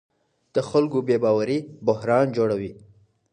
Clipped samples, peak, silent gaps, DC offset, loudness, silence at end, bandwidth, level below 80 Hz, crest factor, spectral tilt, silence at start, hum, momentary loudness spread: under 0.1%; -6 dBFS; none; under 0.1%; -23 LUFS; 0.6 s; 9.6 kHz; -62 dBFS; 18 dB; -7.5 dB/octave; 0.55 s; none; 8 LU